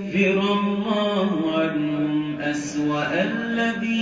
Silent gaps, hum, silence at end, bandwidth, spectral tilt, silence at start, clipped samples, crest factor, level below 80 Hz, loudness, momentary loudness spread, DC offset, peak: none; none; 0 s; 9.2 kHz; -5.5 dB/octave; 0 s; under 0.1%; 14 dB; -60 dBFS; -23 LUFS; 5 LU; under 0.1%; -8 dBFS